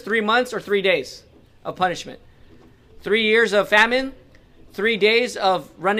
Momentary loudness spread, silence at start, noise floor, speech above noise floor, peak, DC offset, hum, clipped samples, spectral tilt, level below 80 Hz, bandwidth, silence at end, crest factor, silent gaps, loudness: 19 LU; 0.05 s; -49 dBFS; 29 dB; -2 dBFS; under 0.1%; none; under 0.1%; -3.5 dB/octave; -52 dBFS; 15.5 kHz; 0 s; 18 dB; none; -19 LUFS